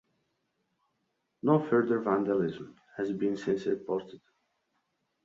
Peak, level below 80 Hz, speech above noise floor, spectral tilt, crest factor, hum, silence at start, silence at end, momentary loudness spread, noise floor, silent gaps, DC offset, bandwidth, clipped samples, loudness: -12 dBFS; -72 dBFS; 50 dB; -8 dB/octave; 20 dB; none; 1.45 s; 1.1 s; 10 LU; -79 dBFS; none; under 0.1%; 7.6 kHz; under 0.1%; -30 LUFS